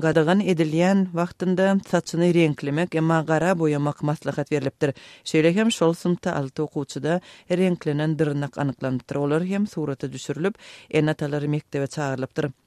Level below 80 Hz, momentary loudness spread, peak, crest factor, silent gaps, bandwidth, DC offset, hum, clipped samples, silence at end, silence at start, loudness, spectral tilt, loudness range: -62 dBFS; 8 LU; -6 dBFS; 18 dB; none; 13 kHz; under 0.1%; none; under 0.1%; 0.15 s; 0 s; -23 LUFS; -6.5 dB/octave; 4 LU